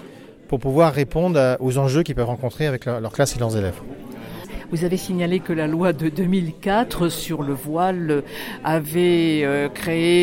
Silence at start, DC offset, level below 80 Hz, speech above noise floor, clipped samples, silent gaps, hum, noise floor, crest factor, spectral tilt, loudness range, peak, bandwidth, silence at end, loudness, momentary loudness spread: 0 s; under 0.1%; -42 dBFS; 21 dB; under 0.1%; none; none; -42 dBFS; 16 dB; -6 dB/octave; 4 LU; -4 dBFS; 17 kHz; 0 s; -21 LUFS; 10 LU